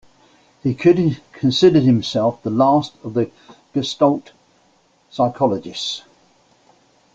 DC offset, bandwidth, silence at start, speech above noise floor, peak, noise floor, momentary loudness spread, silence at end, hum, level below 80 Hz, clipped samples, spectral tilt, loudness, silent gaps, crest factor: under 0.1%; 8 kHz; 0.65 s; 41 dB; -2 dBFS; -58 dBFS; 12 LU; 1.15 s; none; -56 dBFS; under 0.1%; -6.5 dB/octave; -18 LUFS; none; 18 dB